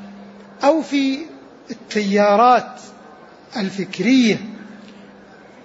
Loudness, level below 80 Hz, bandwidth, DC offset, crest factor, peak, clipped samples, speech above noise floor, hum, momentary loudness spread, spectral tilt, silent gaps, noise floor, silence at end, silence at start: -17 LUFS; -66 dBFS; 8 kHz; under 0.1%; 16 dB; -4 dBFS; under 0.1%; 26 dB; none; 23 LU; -5.5 dB/octave; none; -43 dBFS; 0.75 s; 0 s